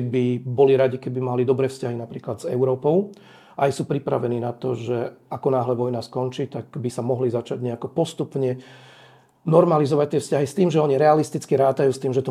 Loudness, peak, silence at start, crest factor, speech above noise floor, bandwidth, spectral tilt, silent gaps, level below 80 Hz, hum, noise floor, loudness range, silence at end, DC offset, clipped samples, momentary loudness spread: -22 LUFS; -2 dBFS; 0 s; 20 dB; 30 dB; 13.5 kHz; -7.5 dB/octave; none; -70 dBFS; none; -51 dBFS; 6 LU; 0 s; under 0.1%; under 0.1%; 12 LU